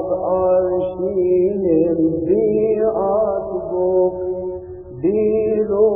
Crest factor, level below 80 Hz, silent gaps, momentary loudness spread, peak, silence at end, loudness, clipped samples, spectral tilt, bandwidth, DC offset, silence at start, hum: 12 dB; -46 dBFS; none; 8 LU; -4 dBFS; 0 s; -18 LUFS; under 0.1%; -13.5 dB/octave; 3.4 kHz; under 0.1%; 0 s; none